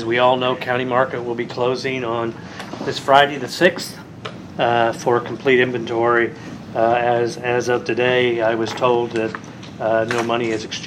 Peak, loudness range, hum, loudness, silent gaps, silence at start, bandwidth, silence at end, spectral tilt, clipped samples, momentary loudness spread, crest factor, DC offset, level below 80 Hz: 0 dBFS; 2 LU; none; -19 LUFS; none; 0 s; 15 kHz; 0 s; -5 dB/octave; under 0.1%; 12 LU; 20 dB; under 0.1%; -58 dBFS